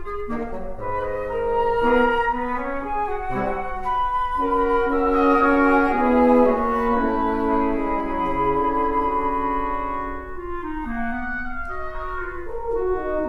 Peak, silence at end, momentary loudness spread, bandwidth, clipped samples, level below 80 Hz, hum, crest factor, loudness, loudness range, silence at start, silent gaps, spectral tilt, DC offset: -4 dBFS; 0 s; 13 LU; 12 kHz; under 0.1%; -38 dBFS; none; 18 dB; -22 LUFS; 9 LU; 0 s; none; -7.5 dB/octave; under 0.1%